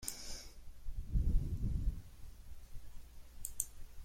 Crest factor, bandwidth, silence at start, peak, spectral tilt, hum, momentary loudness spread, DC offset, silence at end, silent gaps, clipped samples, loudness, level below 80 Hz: 22 dB; 16.5 kHz; 0 s; -16 dBFS; -4.5 dB/octave; none; 20 LU; under 0.1%; 0 s; none; under 0.1%; -42 LUFS; -40 dBFS